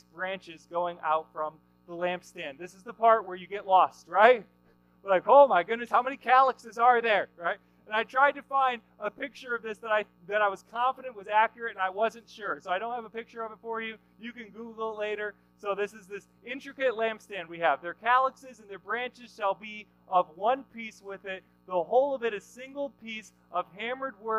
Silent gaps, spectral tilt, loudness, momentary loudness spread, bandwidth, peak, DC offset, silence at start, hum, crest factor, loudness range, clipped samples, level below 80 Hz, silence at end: none; -4 dB/octave; -28 LUFS; 18 LU; 12 kHz; -6 dBFS; under 0.1%; 0.15 s; 60 Hz at -65 dBFS; 24 dB; 11 LU; under 0.1%; -74 dBFS; 0 s